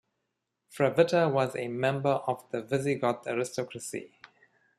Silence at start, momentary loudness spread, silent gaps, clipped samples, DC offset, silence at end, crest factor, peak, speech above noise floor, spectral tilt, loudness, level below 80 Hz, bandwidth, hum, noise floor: 0.7 s; 12 LU; none; under 0.1%; under 0.1%; 0.7 s; 22 dB; -8 dBFS; 54 dB; -5.5 dB/octave; -29 LUFS; -72 dBFS; 13.5 kHz; none; -82 dBFS